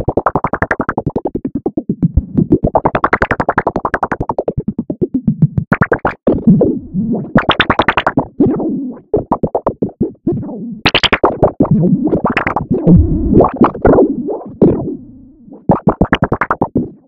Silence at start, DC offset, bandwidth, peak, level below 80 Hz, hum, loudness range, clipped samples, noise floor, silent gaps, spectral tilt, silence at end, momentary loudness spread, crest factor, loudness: 0 s; under 0.1%; 7.8 kHz; 0 dBFS; -28 dBFS; none; 4 LU; under 0.1%; -37 dBFS; none; -8 dB/octave; 0.15 s; 9 LU; 14 dB; -14 LUFS